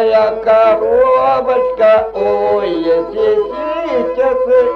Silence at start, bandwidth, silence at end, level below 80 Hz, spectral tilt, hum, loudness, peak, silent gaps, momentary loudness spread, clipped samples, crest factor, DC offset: 0 s; 6 kHz; 0 s; -44 dBFS; -6.5 dB/octave; none; -13 LUFS; -2 dBFS; none; 6 LU; under 0.1%; 10 dB; under 0.1%